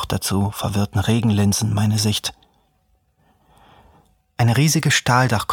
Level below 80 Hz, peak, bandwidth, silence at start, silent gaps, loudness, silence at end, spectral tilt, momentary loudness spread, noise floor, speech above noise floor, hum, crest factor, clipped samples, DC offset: -46 dBFS; -2 dBFS; 18.5 kHz; 0 s; none; -19 LUFS; 0 s; -4.5 dB/octave; 7 LU; -63 dBFS; 45 dB; none; 18 dB; under 0.1%; under 0.1%